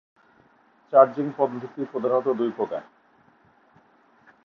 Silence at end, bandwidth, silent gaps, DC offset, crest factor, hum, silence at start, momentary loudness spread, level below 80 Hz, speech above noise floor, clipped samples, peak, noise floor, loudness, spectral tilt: 1.65 s; 5.8 kHz; none; under 0.1%; 24 dB; none; 0.9 s; 13 LU; -76 dBFS; 37 dB; under 0.1%; -2 dBFS; -60 dBFS; -24 LUFS; -9 dB/octave